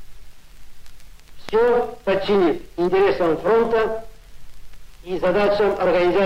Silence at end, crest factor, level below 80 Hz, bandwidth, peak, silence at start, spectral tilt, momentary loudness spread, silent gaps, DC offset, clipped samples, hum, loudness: 0 s; 12 dB; -44 dBFS; 15.5 kHz; -8 dBFS; 0 s; -6.5 dB/octave; 6 LU; none; under 0.1%; under 0.1%; none; -19 LUFS